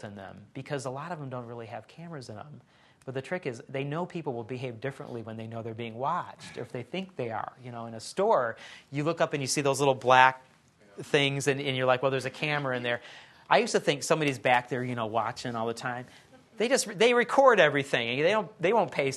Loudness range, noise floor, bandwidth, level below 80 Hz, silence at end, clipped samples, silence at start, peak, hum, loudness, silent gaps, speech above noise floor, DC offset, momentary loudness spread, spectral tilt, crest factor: 12 LU; -59 dBFS; 12.5 kHz; -72 dBFS; 0 s; under 0.1%; 0 s; -4 dBFS; none; -28 LUFS; none; 31 dB; under 0.1%; 19 LU; -4 dB/octave; 24 dB